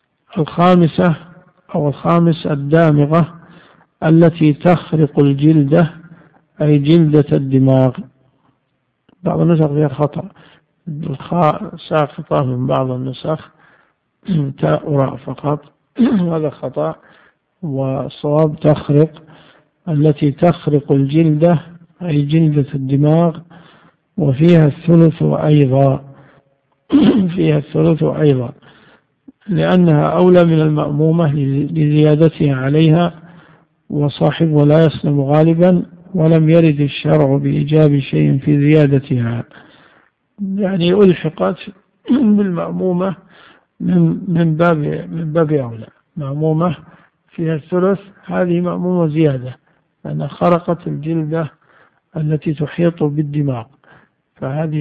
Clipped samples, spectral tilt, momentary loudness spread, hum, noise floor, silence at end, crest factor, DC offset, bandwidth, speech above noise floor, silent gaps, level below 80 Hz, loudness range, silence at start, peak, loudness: under 0.1%; -11 dB/octave; 13 LU; none; -66 dBFS; 0 s; 14 dB; under 0.1%; 4.8 kHz; 53 dB; none; -48 dBFS; 6 LU; 0.35 s; 0 dBFS; -14 LUFS